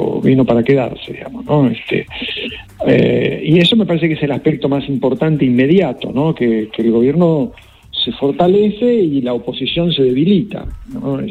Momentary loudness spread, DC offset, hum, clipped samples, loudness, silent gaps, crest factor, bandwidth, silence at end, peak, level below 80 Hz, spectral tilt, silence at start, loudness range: 11 LU; under 0.1%; none; under 0.1%; -14 LUFS; none; 14 dB; 11.5 kHz; 0 s; 0 dBFS; -42 dBFS; -8 dB/octave; 0 s; 1 LU